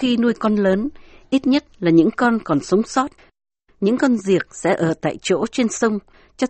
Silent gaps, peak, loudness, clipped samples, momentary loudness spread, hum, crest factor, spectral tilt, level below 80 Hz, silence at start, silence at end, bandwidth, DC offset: none; -2 dBFS; -19 LUFS; under 0.1%; 6 LU; none; 16 dB; -5.5 dB/octave; -52 dBFS; 0 s; 0 s; 8.8 kHz; under 0.1%